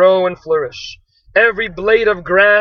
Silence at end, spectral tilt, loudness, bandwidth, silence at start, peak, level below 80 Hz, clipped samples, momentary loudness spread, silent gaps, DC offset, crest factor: 0 s; -5 dB/octave; -14 LUFS; 6.6 kHz; 0 s; 0 dBFS; -44 dBFS; under 0.1%; 13 LU; none; under 0.1%; 14 dB